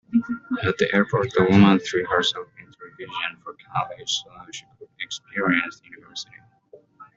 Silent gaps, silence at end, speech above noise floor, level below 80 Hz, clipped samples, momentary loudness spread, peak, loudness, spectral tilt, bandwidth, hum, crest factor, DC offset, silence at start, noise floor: none; 0.1 s; 31 dB; -60 dBFS; under 0.1%; 22 LU; -2 dBFS; -22 LUFS; -5 dB/octave; 7.8 kHz; none; 22 dB; under 0.1%; 0.1 s; -52 dBFS